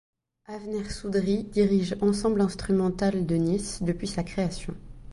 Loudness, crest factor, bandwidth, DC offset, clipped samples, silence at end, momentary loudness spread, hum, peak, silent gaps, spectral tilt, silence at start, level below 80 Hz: -27 LUFS; 16 dB; 11.5 kHz; under 0.1%; under 0.1%; 0 s; 12 LU; none; -10 dBFS; none; -6.5 dB/octave; 0.5 s; -46 dBFS